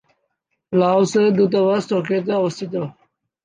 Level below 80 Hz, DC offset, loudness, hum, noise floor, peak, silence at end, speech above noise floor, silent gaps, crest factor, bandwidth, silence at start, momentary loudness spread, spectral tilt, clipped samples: -68 dBFS; under 0.1%; -19 LUFS; none; -73 dBFS; -4 dBFS; 0.55 s; 56 dB; none; 14 dB; 9.6 kHz; 0.7 s; 10 LU; -6.5 dB/octave; under 0.1%